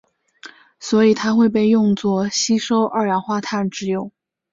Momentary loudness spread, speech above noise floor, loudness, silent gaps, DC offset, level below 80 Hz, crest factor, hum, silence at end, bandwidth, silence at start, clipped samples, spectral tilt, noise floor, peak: 9 LU; 26 dB; -18 LUFS; none; under 0.1%; -60 dBFS; 14 dB; none; 0.45 s; 7.8 kHz; 0.45 s; under 0.1%; -5 dB/octave; -44 dBFS; -4 dBFS